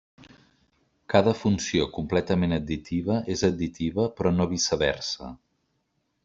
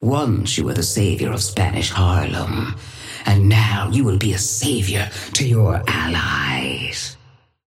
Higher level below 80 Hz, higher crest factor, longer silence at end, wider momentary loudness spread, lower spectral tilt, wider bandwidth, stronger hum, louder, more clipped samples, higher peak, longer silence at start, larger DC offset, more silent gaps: second, -50 dBFS vs -38 dBFS; first, 24 dB vs 16 dB; first, 0.9 s vs 0.55 s; about the same, 7 LU vs 8 LU; about the same, -5 dB/octave vs -4.5 dB/octave; second, 7.8 kHz vs 15.5 kHz; neither; second, -26 LUFS vs -19 LUFS; neither; about the same, -4 dBFS vs -4 dBFS; first, 0.2 s vs 0 s; neither; neither